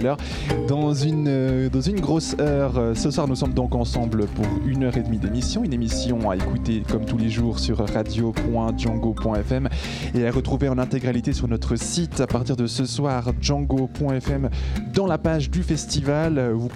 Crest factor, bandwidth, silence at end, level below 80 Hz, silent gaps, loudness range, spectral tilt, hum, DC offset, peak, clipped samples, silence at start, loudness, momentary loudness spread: 16 dB; 12.5 kHz; 0 s; -32 dBFS; none; 2 LU; -6 dB/octave; none; under 0.1%; -6 dBFS; under 0.1%; 0 s; -23 LUFS; 3 LU